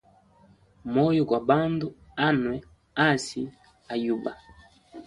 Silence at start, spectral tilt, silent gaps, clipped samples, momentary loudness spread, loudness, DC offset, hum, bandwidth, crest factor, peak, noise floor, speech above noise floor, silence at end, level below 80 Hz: 0.85 s; -6 dB/octave; none; under 0.1%; 13 LU; -26 LUFS; under 0.1%; none; 11.5 kHz; 22 dB; -6 dBFS; -58 dBFS; 33 dB; 0.05 s; -58 dBFS